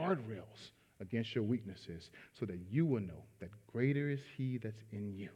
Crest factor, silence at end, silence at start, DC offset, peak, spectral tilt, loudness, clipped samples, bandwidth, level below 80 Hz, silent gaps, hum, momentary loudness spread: 18 dB; 0 s; 0 s; under 0.1%; -20 dBFS; -8 dB/octave; -40 LUFS; under 0.1%; 10.5 kHz; -76 dBFS; none; none; 19 LU